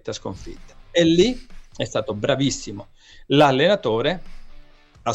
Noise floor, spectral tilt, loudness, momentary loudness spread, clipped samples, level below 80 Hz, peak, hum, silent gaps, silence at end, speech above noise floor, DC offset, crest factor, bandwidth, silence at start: -45 dBFS; -5 dB/octave; -20 LUFS; 19 LU; under 0.1%; -42 dBFS; -4 dBFS; none; none; 0 s; 24 dB; under 0.1%; 18 dB; 10 kHz; 0.05 s